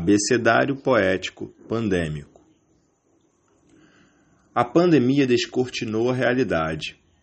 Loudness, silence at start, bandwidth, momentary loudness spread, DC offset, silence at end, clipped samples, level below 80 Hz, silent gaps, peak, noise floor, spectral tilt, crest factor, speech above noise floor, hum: -21 LUFS; 0 s; 8.8 kHz; 13 LU; under 0.1%; 0.3 s; under 0.1%; -52 dBFS; none; -4 dBFS; -64 dBFS; -5 dB/octave; 20 dB; 43 dB; none